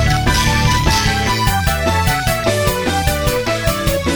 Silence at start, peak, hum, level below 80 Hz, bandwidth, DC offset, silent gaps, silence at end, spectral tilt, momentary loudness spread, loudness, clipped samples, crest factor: 0 s; 0 dBFS; none; -22 dBFS; over 20 kHz; under 0.1%; none; 0 s; -4 dB/octave; 3 LU; -15 LUFS; under 0.1%; 14 dB